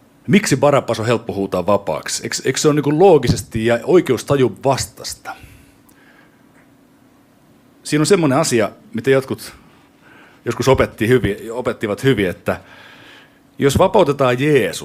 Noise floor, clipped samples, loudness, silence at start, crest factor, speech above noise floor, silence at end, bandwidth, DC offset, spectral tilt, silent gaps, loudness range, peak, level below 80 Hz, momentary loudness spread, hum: -51 dBFS; under 0.1%; -16 LUFS; 0.25 s; 16 dB; 35 dB; 0 s; 16 kHz; under 0.1%; -5 dB/octave; none; 7 LU; 0 dBFS; -42 dBFS; 13 LU; none